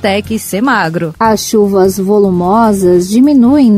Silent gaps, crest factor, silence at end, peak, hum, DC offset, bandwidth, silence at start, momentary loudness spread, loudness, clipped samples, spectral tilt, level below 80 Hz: none; 8 dB; 0 s; 0 dBFS; none; under 0.1%; 16 kHz; 0 s; 7 LU; -10 LUFS; under 0.1%; -5.5 dB/octave; -40 dBFS